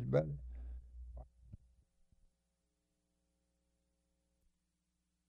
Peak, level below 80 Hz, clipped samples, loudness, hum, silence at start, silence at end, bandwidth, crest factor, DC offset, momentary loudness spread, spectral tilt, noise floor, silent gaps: -20 dBFS; -56 dBFS; under 0.1%; -43 LUFS; 60 Hz at -70 dBFS; 0 s; 3.7 s; 6.8 kHz; 26 dB; under 0.1%; 25 LU; -9.5 dB/octave; -85 dBFS; none